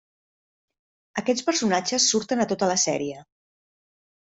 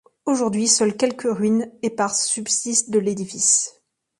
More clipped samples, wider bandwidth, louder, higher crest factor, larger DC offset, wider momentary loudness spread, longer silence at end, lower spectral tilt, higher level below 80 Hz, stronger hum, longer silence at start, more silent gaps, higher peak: neither; second, 8.4 kHz vs 11.5 kHz; second, -23 LUFS vs -20 LUFS; about the same, 20 dB vs 18 dB; neither; first, 12 LU vs 7 LU; first, 1 s vs 0.5 s; about the same, -2.5 dB/octave vs -3 dB/octave; about the same, -68 dBFS vs -66 dBFS; neither; first, 1.15 s vs 0.25 s; neither; second, -8 dBFS vs -4 dBFS